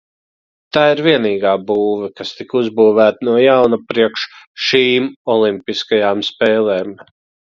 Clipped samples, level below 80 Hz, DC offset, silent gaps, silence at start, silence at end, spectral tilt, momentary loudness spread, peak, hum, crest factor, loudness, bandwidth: under 0.1%; -58 dBFS; under 0.1%; 4.47-4.55 s, 5.16-5.25 s; 0.75 s; 0.6 s; -5.5 dB/octave; 10 LU; 0 dBFS; none; 14 dB; -14 LUFS; 7.2 kHz